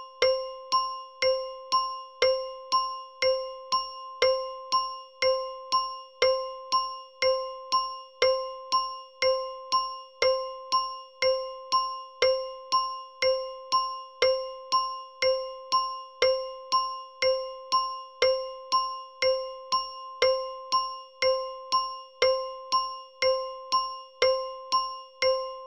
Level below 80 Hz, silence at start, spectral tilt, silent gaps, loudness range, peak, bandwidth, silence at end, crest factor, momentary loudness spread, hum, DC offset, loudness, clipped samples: -64 dBFS; 0 s; -0.5 dB/octave; none; 0 LU; -10 dBFS; 10.5 kHz; 0 s; 20 dB; 6 LU; none; under 0.1%; -28 LUFS; under 0.1%